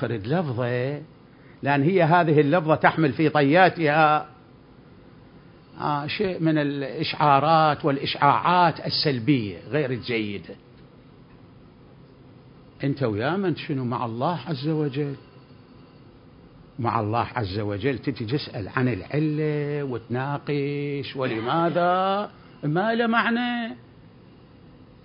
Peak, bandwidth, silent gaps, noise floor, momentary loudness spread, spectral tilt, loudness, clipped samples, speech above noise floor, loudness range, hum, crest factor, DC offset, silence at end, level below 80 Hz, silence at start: -2 dBFS; 5.4 kHz; none; -50 dBFS; 11 LU; -11 dB/octave; -23 LUFS; under 0.1%; 27 dB; 9 LU; none; 22 dB; under 0.1%; 1.25 s; -56 dBFS; 0 s